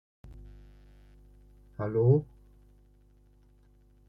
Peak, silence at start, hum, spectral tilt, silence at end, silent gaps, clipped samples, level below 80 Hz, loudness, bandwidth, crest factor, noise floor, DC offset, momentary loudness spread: -10 dBFS; 0.25 s; 50 Hz at -50 dBFS; -12 dB/octave; 1.85 s; none; under 0.1%; -56 dBFS; -27 LUFS; 2.4 kHz; 24 dB; -61 dBFS; under 0.1%; 29 LU